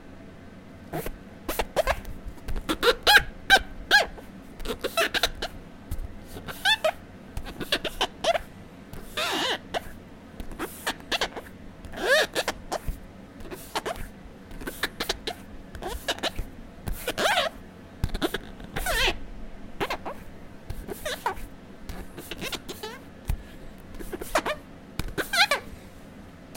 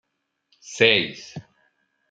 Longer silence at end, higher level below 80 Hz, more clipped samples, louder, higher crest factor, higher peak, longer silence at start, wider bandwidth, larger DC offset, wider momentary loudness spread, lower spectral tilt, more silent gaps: second, 0 s vs 0.7 s; first, -40 dBFS vs -68 dBFS; neither; second, -27 LUFS vs -19 LUFS; about the same, 26 dB vs 26 dB; second, -4 dBFS vs 0 dBFS; second, 0 s vs 0.7 s; first, 17 kHz vs 9 kHz; neither; about the same, 24 LU vs 23 LU; about the same, -2.5 dB/octave vs -3 dB/octave; neither